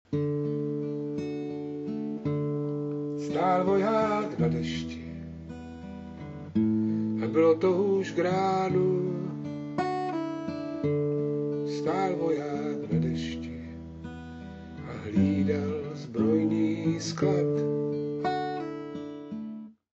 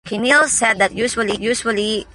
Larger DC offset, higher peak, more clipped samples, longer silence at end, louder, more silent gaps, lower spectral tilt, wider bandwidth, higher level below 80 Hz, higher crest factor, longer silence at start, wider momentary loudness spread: neither; second, -12 dBFS vs -2 dBFS; neither; first, 0.25 s vs 0.1 s; second, -29 LUFS vs -16 LUFS; neither; first, -7.5 dB/octave vs -2 dB/octave; second, 8.2 kHz vs 11.5 kHz; second, -56 dBFS vs -48 dBFS; about the same, 16 dB vs 14 dB; about the same, 0.1 s vs 0.05 s; first, 16 LU vs 7 LU